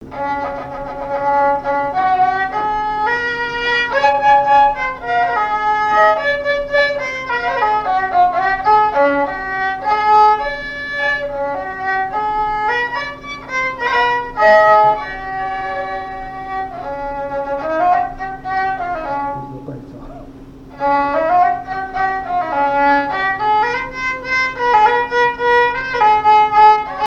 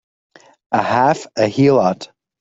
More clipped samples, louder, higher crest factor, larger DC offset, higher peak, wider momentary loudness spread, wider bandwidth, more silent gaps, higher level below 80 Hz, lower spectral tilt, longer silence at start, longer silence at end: neither; about the same, -16 LUFS vs -16 LUFS; about the same, 14 dB vs 16 dB; neither; about the same, 0 dBFS vs -2 dBFS; about the same, 13 LU vs 11 LU; about the same, 7.4 kHz vs 7.8 kHz; neither; first, -42 dBFS vs -58 dBFS; second, -4.5 dB/octave vs -6.5 dB/octave; second, 0 s vs 0.7 s; second, 0 s vs 0.35 s